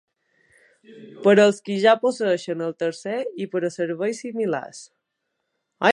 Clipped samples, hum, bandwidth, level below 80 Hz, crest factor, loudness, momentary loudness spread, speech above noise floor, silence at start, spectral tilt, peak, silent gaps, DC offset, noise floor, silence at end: under 0.1%; none; 11 kHz; -76 dBFS; 22 dB; -22 LUFS; 12 LU; 56 dB; 0.9 s; -5 dB/octave; -2 dBFS; none; under 0.1%; -78 dBFS; 0 s